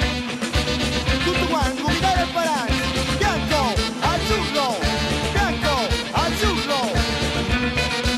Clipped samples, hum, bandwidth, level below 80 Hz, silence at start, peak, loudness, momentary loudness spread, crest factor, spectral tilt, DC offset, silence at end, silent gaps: under 0.1%; none; 15.5 kHz; -30 dBFS; 0 s; -10 dBFS; -21 LUFS; 2 LU; 10 dB; -4 dB/octave; under 0.1%; 0 s; none